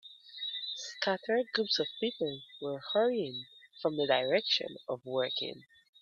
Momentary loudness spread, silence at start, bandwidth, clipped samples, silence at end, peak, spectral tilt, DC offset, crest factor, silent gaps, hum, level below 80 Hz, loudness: 12 LU; 0.05 s; 7.6 kHz; under 0.1%; 0.4 s; -12 dBFS; -4 dB/octave; under 0.1%; 22 dB; none; none; -80 dBFS; -33 LUFS